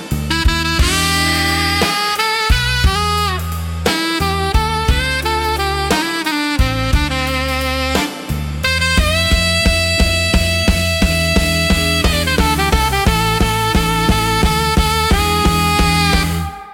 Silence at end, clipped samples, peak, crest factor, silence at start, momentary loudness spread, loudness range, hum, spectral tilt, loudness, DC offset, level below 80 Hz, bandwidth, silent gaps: 0 s; under 0.1%; 0 dBFS; 14 dB; 0 s; 4 LU; 3 LU; none; -4 dB/octave; -15 LUFS; under 0.1%; -22 dBFS; 17 kHz; none